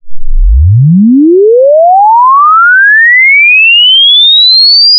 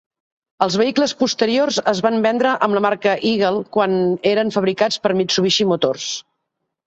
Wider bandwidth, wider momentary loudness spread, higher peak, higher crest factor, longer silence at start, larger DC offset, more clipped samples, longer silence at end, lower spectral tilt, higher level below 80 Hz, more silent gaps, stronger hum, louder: second, 5.2 kHz vs 8.2 kHz; first, 6 LU vs 3 LU; about the same, 0 dBFS vs -2 dBFS; second, 4 dB vs 16 dB; second, 0.05 s vs 0.6 s; neither; first, 0.5% vs under 0.1%; second, 0 s vs 0.65 s; first, -10.5 dB/octave vs -4 dB/octave; first, -14 dBFS vs -60 dBFS; neither; neither; first, -2 LUFS vs -18 LUFS